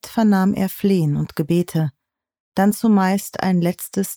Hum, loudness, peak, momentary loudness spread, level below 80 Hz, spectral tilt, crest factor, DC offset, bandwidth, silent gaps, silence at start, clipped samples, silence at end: none; -19 LUFS; -6 dBFS; 7 LU; -54 dBFS; -6.5 dB/octave; 14 dB; under 0.1%; over 20 kHz; 2.40-2.52 s; 0.05 s; under 0.1%; 0 s